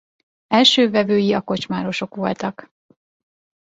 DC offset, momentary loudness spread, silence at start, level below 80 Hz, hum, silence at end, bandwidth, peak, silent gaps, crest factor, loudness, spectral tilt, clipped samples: under 0.1%; 12 LU; 0.5 s; -60 dBFS; none; 1.1 s; 8.2 kHz; -2 dBFS; none; 18 dB; -18 LUFS; -4.5 dB/octave; under 0.1%